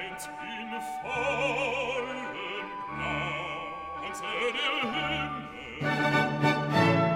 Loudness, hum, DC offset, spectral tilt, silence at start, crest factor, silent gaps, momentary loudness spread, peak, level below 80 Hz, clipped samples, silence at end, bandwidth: -30 LUFS; none; under 0.1%; -5 dB/octave; 0 s; 18 dB; none; 12 LU; -12 dBFS; -56 dBFS; under 0.1%; 0 s; 16.5 kHz